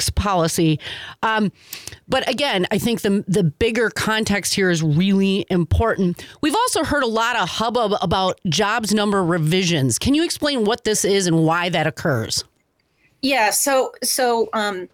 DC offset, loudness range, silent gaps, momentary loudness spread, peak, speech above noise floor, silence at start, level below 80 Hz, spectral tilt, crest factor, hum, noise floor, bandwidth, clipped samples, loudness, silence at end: under 0.1%; 2 LU; none; 6 LU; -8 dBFS; 46 dB; 0 s; -42 dBFS; -4 dB/octave; 10 dB; none; -65 dBFS; 19.5 kHz; under 0.1%; -19 LUFS; 0.1 s